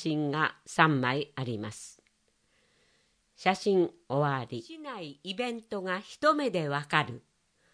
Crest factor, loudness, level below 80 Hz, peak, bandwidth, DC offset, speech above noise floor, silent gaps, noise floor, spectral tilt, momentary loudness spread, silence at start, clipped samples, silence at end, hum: 26 dB; -30 LUFS; -74 dBFS; -6 dBFS; 10.5 kHz; under 0.1%; 42 dB; none; -72 dBFS; -5.5 dB/octave; 15 LU; 0 s; under 0.1%; 0.55 s; none